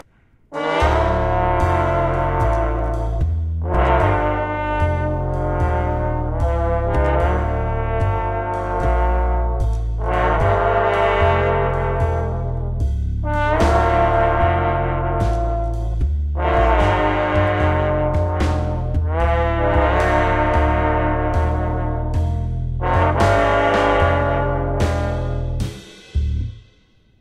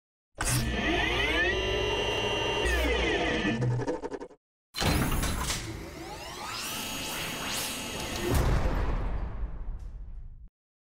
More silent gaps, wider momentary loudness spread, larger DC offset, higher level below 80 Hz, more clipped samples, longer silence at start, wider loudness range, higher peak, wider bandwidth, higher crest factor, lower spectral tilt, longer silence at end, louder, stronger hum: second, none vs 4.37-4.73 s; second, 7 LU vs 14 LU; neither; first, -24 dBFS vs -36 dBFS; neither; about the same, 0.5 s vs 0.4 s; second, 2 LU vs 5 LU; first, -2 dBFS vs -14 dBFS; second, 10 kHz vs 16 kHz; about the same, 16 dB vs 16 dB; first, -7.5 dB/octave vs -4 dB/octave; first, 0.6 s vs 0.45 s; first, -19 LUFS vs -29 LUFS; neither